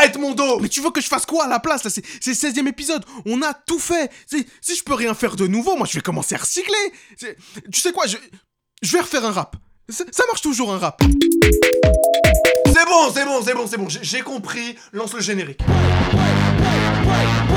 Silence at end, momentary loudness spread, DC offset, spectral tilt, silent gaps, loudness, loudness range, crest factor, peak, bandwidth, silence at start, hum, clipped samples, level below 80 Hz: 0 s; 12 LU; under 0.1%; -4 dB/octave; none; -18 LUFS; 7 LU; 18 dB; 0 dBFS; over 20 kHz; 0 s; none; under 0.1%; -30 dBFS